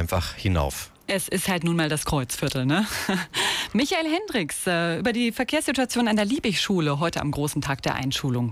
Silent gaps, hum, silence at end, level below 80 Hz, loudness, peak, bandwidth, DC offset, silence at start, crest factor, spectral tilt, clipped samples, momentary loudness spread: none; none; 0 s; -42 dBFS; -24 LUFS; -12 dBFS; 16 kHz; under 0.1%; 0 s; 12 dB; -4.5 dB/octave; under 0.1%; 4 LU